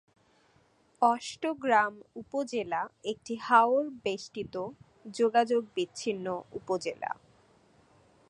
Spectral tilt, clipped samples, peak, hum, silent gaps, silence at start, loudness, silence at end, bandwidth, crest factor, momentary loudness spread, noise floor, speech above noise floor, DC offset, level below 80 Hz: -4 dB/octave; under 0.1%; -8 dBFS; none; none; 1 s; -30 LUFS; 1.15 s; 11 kHz; 22 dB; 14 LU; -66 dBFS; 36 dB; under 0.1%; -72 dBFS